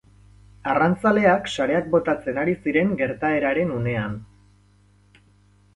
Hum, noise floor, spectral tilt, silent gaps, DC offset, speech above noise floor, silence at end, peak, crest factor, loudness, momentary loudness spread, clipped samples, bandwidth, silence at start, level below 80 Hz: 50 Hz at -45 dBFS; -57 dBFS; -7 dB/octave; none; under 0.1%; 35 dB; 1.5 s; -4 dBFS; 18 dB; -22 LUFS; 8 LU; under 0.1%; 11.5 kHz; 0.65 s; -52 dBFS